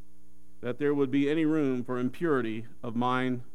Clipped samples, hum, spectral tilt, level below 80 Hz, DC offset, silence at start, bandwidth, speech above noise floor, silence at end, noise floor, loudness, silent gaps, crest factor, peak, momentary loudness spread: under 0.1%; none; -7.5 dB/octave; -66 dBFS; 1%; 0.6 s; 11.5 kHz; 33 dB; 0.1 s; -62 dBFS; -29 LUFS; none; 16 dB; -14 dBFS; 10 LU